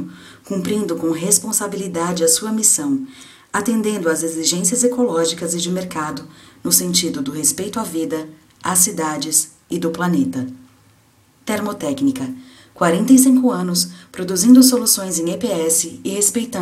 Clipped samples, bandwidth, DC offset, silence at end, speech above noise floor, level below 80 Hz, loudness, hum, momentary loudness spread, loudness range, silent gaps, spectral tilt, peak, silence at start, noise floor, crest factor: under 0.1%; 16 kHz; under 0.1%; 0 s; 36 dB; -60 dBFS; -17 LUFS; none; 14 LU; 6 LU; none; -3.5 dB/octave; 0 dBFS; 0 s; -54 dBFS; 18 dB